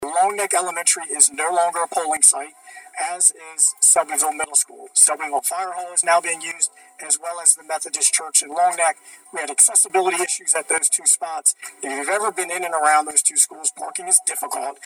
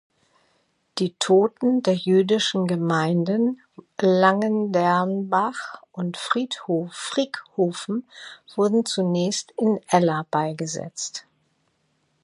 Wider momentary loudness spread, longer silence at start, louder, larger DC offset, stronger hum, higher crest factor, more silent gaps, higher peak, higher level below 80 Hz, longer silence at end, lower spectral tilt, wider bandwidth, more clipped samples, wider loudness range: about the same, 11 LU vs 12 LU; second, 0 s vs 0.95 s; first, -17 LUFS vs -23 LUFS; neither; neither; about the same, 20 dB vs 20 dB; neither; about the same, 0 dBFS vs -2 dBFS; about the same, -76 dBFS vs -72 dBFS; second, 0 s vs 1.05 s; second, 1.5 dB/octave vs -5 dB/octave; first, over 20 kHz vs 11.5 kHz; neither; second, 2 LU vs 5 LU